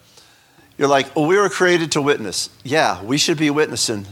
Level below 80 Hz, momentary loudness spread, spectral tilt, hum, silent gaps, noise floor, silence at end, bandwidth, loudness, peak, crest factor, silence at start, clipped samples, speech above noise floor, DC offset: -62 dBFS; 5 LU; -3.5 dB/octave; none; none; -51 dBFS; 0 s; 17.5 kHz; -18 LUFS; 0 dBFS; 18 dB; 0.8 s; under 0.1%; 34 dB; under 0.1%